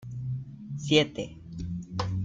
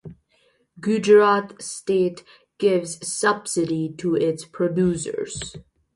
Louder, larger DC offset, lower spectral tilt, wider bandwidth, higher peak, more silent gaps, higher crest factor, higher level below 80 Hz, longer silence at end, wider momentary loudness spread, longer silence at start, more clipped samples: second, -30 LUFS vs -22 LUFS; neither; about the same, -5.5 dB/octave vs -5 dB/octave; second, 9.2 kHz vs 11.5 kHz; second, -8 dBFS vs -4 dBFS; neither; about the same, 22 dB vs 18 dB; about the same, -52 dBFS vs -56 dBFS; second, 0 s vs 0.35 s; about the same, 15 LU vs 15 LU; about the same, 0 s vs 0.05 s; neither